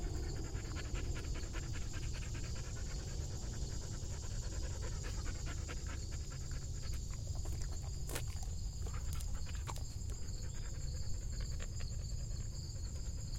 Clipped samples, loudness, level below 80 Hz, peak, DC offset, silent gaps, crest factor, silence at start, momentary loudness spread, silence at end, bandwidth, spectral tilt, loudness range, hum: under 0.1%; -44 LUFS; -44 dBFS; -20 dBFS; under 0.1%; none; 20 dB; 0 s; 2 LU; 0 s; 16.5 kHz; -4.5 dB/octave; 1 LU; none